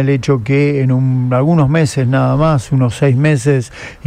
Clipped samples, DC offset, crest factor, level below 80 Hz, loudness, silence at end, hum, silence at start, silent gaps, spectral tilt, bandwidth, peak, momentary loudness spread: under 0.1%; under 0.1%; 12 dB; -38 dBFS; -13 LUFS; 0.15 s; none; 0 s; none; -7.5 dB/octave; 10.5 kHz; 0 dBFS; 3 LU